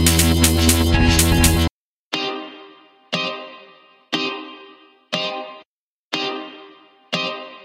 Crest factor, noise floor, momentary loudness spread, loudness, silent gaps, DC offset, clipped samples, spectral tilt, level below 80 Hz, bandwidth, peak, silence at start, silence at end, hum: 20 dB; -65 dBFS; 18 LU; -19 LUFS; 1.71-2.11 s, 5.65-6.11 s; under 0.1%; under 0.1%; -3.5 dB/octave; -28 dBFS; 16 kHz; 0 dBFS; 0 s; 0.05 s; none